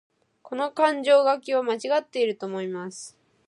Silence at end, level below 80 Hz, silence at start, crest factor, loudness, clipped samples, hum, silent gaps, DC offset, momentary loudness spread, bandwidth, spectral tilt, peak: 0.4 s; -82 dBFS; 0.45 s; 18 dB; -24 LUFS; under 0.1%; none; none; under 0.1%; 17 LU; 11.5 kHz; -4 dB/octave; -6 dBFS